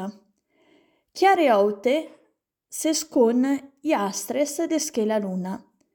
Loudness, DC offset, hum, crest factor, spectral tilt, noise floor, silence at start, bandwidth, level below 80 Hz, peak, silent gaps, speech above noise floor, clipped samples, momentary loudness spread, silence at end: -23 LUFS; under 0.1%; none; 16 dB; -4 dB/octave; -69 dBFS; 0 s; 19 kHz; -74 dBFS; -8 dBFS; none; 46 dB; under 0.1%; 16 LU; 0.4 s